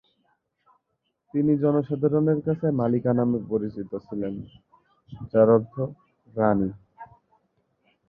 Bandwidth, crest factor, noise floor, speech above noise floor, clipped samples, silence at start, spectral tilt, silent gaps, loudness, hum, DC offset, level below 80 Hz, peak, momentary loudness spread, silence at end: 4.4 kHz; 20 dB; -77 dBFS; 54 dB; under 0.1%; 1.35 s; -13 dB/octave; none; -24 LUFS; none; under 0.1%; -58 dBFS; -6 dBFS; 13 LU; 1.05 s